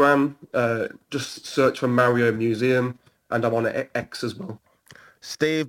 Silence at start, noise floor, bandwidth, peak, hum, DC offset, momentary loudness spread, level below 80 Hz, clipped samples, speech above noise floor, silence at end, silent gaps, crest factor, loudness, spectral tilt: 0 s; -51 dBFS; 17 kHz; -6 dBFS; none; under 0.1%; 13 LU; -64 dBFS; under 0.1%; 29 dB; 0 s; none; 16 dB; -23 LUFS; -6 dB/octave